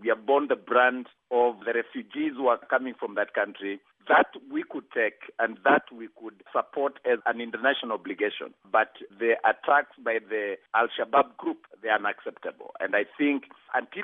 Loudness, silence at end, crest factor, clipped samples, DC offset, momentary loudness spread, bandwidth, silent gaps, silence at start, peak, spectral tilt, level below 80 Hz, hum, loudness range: -27 LUFS; 0 s; 20 dB; under 0.1%; under 0.1%; 13 LU; 3.9 kHz; none; 0 s; -8 dBFS; -7 dB/octave; -86 dBFS; none; 2 LU